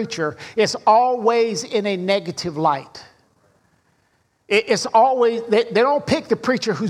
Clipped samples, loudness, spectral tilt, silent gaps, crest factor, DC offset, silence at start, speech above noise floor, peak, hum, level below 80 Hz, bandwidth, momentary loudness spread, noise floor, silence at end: under 0.1%; -19 LUFS; -4.5 dB/octave; none; 18 dB; under 0.1%; 0 s; 45 dB; -2 dBFS; none; -60 dBFS; 12.5 kHz; 9 LU; -64 dBFS; 0 s